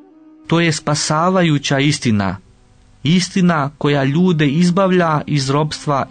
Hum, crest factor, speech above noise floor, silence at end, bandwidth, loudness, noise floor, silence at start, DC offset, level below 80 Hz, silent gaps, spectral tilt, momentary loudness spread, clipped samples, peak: none; 12 dB; 34 dB; 0.05 s; 9.6 kHz; -16 LUFS; -48 dBFS; 0.5 s; 0.1%; -50 dBFS; none; -5.5 dB/octave; 5 LU; under 0.1%; -4 dBFS